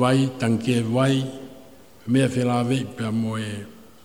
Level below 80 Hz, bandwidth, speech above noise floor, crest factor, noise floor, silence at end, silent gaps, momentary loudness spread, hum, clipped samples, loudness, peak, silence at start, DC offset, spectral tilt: -60 dBFS; 16 kHz; 26 dB; 18 dB; -48 dBFS; 0.3 s; none; 17 LU; none; under 0.1%; -23 LUFS; -6 dBFS; 0 s; 0.3%; -6.5 dB/octave